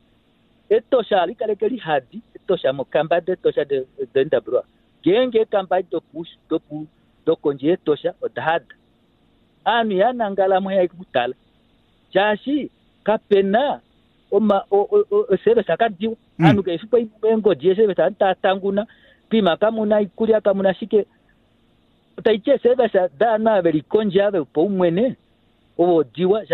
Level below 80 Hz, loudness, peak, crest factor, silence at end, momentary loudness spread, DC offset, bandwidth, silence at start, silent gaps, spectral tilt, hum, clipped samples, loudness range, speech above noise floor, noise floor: -60 dBFS; -20 LUFS; -4 dBFS; 16 dB; 0 s; 9 LU; under 0.1%; 4.4 kHz; 0.7 s; none; -8.5 dB/octave; none; under 0.1%; 4 LU; 40 dB; -59 dBFS